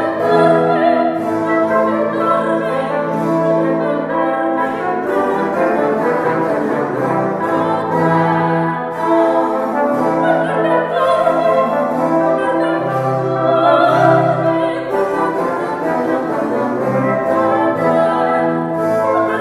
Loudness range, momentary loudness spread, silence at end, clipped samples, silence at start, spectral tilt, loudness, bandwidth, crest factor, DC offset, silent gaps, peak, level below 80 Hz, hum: 2 LU; 5 LU; 0 s; under 0.1%; 0 s; -7.5 dB/octave; -15 LUFS; 13 kHz; 14 dB; under 0.1%; none; 0 dBFS; -58 dBFS; none